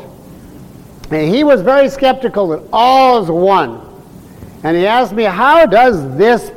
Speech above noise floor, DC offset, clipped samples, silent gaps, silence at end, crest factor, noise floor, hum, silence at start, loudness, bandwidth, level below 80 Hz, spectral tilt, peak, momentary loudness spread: 25 dB; under 0.1%; under 0.1%; none; 0.05 s; 10 dB; -35 dBFS; none; 0 s; -11 LUFS; 16.5 kHz; -42 dBFS; -6 dB/octave; -2 dBFS; 9 LU